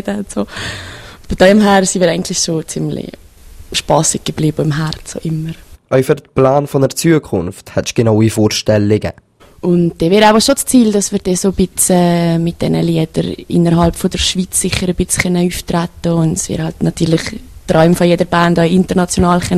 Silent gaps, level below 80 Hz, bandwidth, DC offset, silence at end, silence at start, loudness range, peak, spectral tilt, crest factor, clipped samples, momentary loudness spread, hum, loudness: none; -34 dBFS; 14.5 kHz; 0.2%; 0 s; 0.05 s; 4 LU; 0 dBFS; -5 dB/octave; 14 dB; under 0.1%; 11 LU; none; -13 LUFS